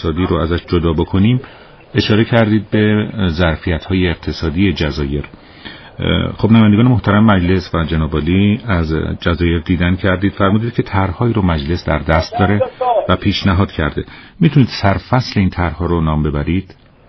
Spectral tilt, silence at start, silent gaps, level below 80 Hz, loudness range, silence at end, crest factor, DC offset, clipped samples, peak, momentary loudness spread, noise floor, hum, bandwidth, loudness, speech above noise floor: -6 dB/octave; 0 s; none; -30 dBFS; 3 LU; 0.35 s; 14 dB; under 0.1%; under 0.1%; 0 dBFS; 8 LU; -35 dBFS; none; 6.2 kHz; -15 LUFS; 21 dB